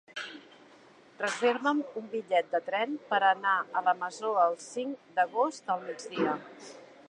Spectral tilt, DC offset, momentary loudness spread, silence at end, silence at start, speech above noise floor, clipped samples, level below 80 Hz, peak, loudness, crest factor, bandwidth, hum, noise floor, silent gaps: -3.5 dB/octave; under 0.1%; 13 LU; 0.25 s; 0.15 s; 27 dB; under 0.1%; -84 dBFS; -12 dBFS; -30 LUFS; 20 dB; 11.5 kHz; none; -57 dBFS; none